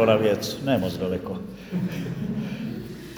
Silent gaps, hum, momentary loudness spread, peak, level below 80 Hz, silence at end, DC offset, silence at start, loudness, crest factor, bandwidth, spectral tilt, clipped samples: none; none; 11 LU; -6 dBFS; -52 dBFS; 0 s; under 0.1%; 0 s; -27 LUFS; 20 dB; over 20 kHz; -6 dB/octave; under 0.1%